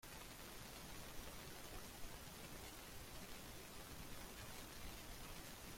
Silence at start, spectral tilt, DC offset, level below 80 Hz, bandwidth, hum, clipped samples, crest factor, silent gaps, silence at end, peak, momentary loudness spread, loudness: 0 s; -3 dB/octave; under 0.1%; -62 dBFS; 16.5 kHz; none; under 0.1%; 16 dB; none; 0 s; -38 dBFS; 1 LU; -54 LUFS